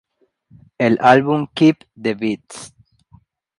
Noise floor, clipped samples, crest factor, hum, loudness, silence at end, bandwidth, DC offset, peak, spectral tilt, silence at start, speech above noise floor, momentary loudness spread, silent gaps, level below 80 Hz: -56 dBFS; under 0.1%; 18 dB; none; -17 LUFS; 0.9 s; 11.5 kHz; under 0.1%; 0 dBFS; -6.5 dB/octave; 0.8 s; 40 dB; 16 LU; none; -60 dBFS